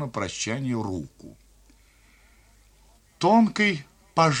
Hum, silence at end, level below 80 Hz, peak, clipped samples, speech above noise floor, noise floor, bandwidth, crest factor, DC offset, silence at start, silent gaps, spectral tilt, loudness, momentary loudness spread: none; 0 s; -58 dBFS; -6 dBFS; under 0.1%; 33 dB; -57 dBFS; 10.5 kHz; 20 dB; under 0.1%; 0 s; none; -5 dB/octave; -24 LUFS; 15 LU